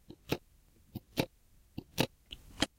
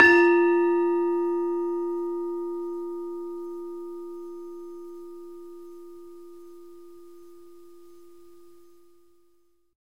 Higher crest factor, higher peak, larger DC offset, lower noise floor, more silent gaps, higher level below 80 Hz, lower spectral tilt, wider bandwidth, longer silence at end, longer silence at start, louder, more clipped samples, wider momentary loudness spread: first, 32 dB vs 26 dB; second, -10 dBFS vs -2 dBFS; second, under 0.1% vs 0.3%; about the same, -64 dBFS vs -67 dBFS; neither; first, -58 dBFS vs -68 dBFS; about the same, -4 dB/octave vs -5 dB/octave; first, 17 kHz vs 6.8 kHz; second, 0.1 s vs 2.55 s; first, 0.3 s vs 0 s; second, -38 LUFS vs -25 LUFS; neither; second, 15 LU vs 26 LU